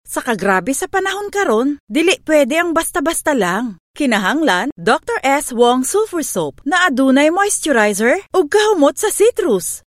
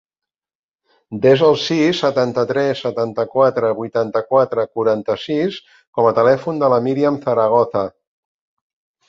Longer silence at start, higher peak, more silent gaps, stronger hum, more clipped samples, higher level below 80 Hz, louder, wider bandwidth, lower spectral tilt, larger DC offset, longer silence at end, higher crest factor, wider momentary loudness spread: second, 0.05 s vs 1.1 s; about the same, 0 dBFS vs -2 dBFS; first, 1.80-1.87 s, 3.80-3.94 s, 4.72-4.76 s vs 5.87-5.93 s; neither; neither; first, -50 dBFS vs -60 dBFS; about the same, -15 LUFS vs -17 LUFS; first, 16.5 kHz vs 7.6 kHz; second, -3 dB/octave vs -6.5 dB/octave; neither; second, 0.1 s vs 1.2 s; about the same, 14 dB vs 16 dB; about the same, 6 LU vs 7 LU